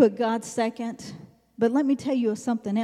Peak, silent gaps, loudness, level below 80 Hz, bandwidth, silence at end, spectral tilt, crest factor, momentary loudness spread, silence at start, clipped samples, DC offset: -6 dBFS; none; -26 LUFS; -70 dBFS; 13 kHz; 0 s; -5.5 dB/octave; 20 dB; 15 LU; 0 s; under 0.1%; under 0.1%